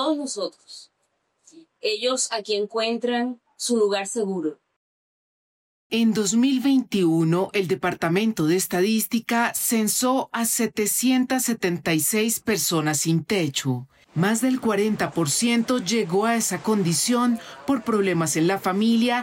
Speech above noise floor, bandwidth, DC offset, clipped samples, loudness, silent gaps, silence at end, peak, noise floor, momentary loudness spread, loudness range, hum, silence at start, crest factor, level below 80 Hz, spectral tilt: 50 dB; 16.5 kHz; under 0.1%; under 0.1%; -22 LUFS; 4.76-5.90 s; 0 s; -12 dBFS; -72 dBFS; 7 LU; 4 LU; none; 0 s; 10 dB; -64 dBFS; -4 dB/octave